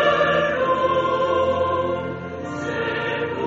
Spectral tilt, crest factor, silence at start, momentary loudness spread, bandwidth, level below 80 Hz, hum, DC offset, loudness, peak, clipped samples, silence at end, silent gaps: -3 dB/octave; 16 dB; 0 s; 10 LU; 7.8 kHz; -50 dBFS; none; under 0.1%; -21 LUFS; -6 dBFS; under 0.1%; 0 s; none